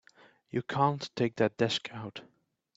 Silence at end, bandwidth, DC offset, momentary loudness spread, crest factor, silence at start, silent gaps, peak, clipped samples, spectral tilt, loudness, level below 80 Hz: 0.55 s; 8 kHz; under 0.1%; 14 LU; 20 dB; 0.55 s; none; -12 dBFS; under 0.1%; -5.5 dB/octave; -31 LUFS; -70 dBFS